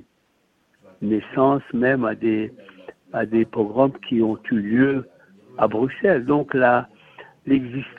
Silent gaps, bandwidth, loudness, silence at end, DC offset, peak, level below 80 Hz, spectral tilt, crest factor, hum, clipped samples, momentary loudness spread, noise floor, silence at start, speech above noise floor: none; 4.4 kHz; -21 LUFS; 0.05 s; under 0.1%; -2 dBFS; -58 dBFS; -9.5 dB/octave; 18 dB; none; under 0.1%; 9 LU; -65 dBFS; 1 s; 45 dB